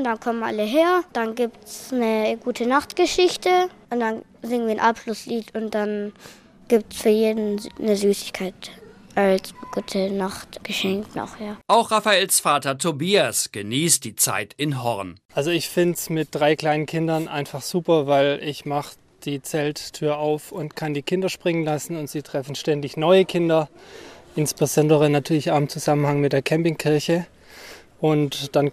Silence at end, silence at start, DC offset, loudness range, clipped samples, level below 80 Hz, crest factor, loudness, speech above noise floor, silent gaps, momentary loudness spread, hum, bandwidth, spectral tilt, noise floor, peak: 0 s; 0 s; under 0.1%; 5 LU; under 0.1%; -58 dBFS; 18 dB; -22 LUFS; 21 dB; 15.25-15.29 s; 12 LU; none; 15.5 kHz; -4.5 dB/octave; -43 dBFS; -4 dBFS